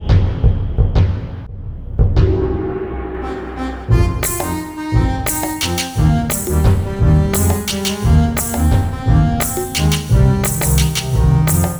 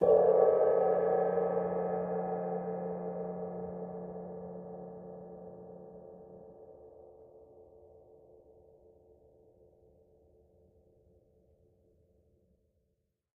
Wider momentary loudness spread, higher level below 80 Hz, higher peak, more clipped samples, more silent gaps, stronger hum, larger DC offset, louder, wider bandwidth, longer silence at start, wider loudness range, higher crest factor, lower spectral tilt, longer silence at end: second, 11 LU vs 27 LU; first, -20 dBFS vs -70 dBFS; first, 0 dBFS vs -14 dBFS; neither; neither; neither; neither; first, -16 LUFS vs -32 LUFS; first, over 20 kHz vs 3 kHz; about the same, 0 s vs 0 s; second, 4 LU vs 26 LU; second, 14 dB vs 22 dB; second, -5.5 dB/octave vs -9 dB/octave; second, 0 s vs 5.95 s